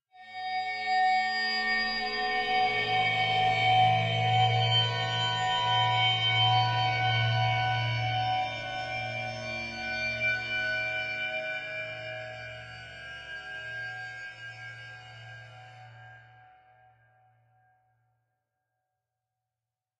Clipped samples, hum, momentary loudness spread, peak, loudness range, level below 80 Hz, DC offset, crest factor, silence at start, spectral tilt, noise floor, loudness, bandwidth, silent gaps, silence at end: under 0.1%; none; 18 LU; -14 dBFS; 16 LU; -60 dBFS; under 0.1%; 16 dB; 0.15 s; -4 dB/octave; -90 dBFS; -27 LUFS; 8.2 kHz; none; 3.8 s